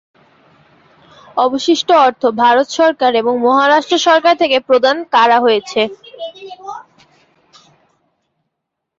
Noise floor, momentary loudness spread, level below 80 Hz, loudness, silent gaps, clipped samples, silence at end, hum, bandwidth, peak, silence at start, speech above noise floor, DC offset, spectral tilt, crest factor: -77 dBFS; 19 LU; -64 dBFS; -12 LUFS; none; under 0.1%; 2.15 s; none; 7.8 kHz; -2 dBFS; 1.35 s; 64 dB; under 0.1%; -2.5 dB/octave; 14 dB